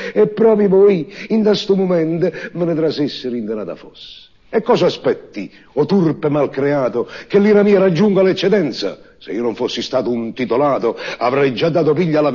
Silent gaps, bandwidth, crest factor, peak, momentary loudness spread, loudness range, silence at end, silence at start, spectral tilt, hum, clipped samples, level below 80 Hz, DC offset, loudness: none; 7.2 kHz; 14 dB; -2 dBFS; 12 LU; 5 LU; 0 s; 0 s; -7 dB/octave; none; under 0.1%; -56 dBFS; 0.2%; -16 LUFS